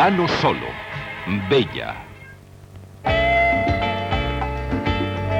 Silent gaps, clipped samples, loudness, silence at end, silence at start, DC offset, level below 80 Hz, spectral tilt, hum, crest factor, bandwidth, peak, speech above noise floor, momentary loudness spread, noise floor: none; under 0.1%; -21 LUFS; 0 s; 0 s; under 0.1%; -34 dBFS; -6.5 dB/octave; none; 16 dB; 16 kHz; -6 dBFS; 22 dB; 13 LU; -42 dBFS